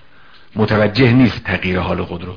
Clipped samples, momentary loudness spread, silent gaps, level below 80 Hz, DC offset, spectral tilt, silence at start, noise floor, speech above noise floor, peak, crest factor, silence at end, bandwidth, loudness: under 0.1%; 10 LU; none; -40 dBFS; 0.9%; -8.5 dB/octave; 0.55 s; -47 dBFS; 32 dB; 0 dBFS; 16 dB; 0 s; 5.4 kHz; -15 LUFS